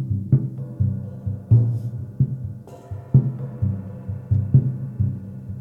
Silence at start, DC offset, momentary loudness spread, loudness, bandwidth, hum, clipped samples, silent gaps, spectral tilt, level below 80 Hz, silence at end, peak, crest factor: 0 s; under 0.1%; 15 LU; -23 LUFS; 1.9 kHz; none; under 0.1%; none; -12 dB/octave; -44 dBFS; 0 s; -4 dBFS; 18 dB